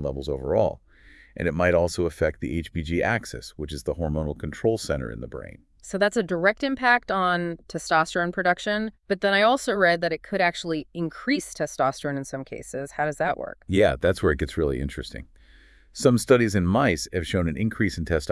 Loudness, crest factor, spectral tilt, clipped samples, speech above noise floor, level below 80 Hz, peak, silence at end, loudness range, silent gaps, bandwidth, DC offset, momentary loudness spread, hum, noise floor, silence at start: -24 LUFS; 20 dB; -5.5 dB/octave; under 0.1%; 29 dB; -44 dBFS; -4 dBFS; 0 s; 5 LU; none; 12 kHz; under 0.1%; 14 LU; none; -53 dBFS; 0 s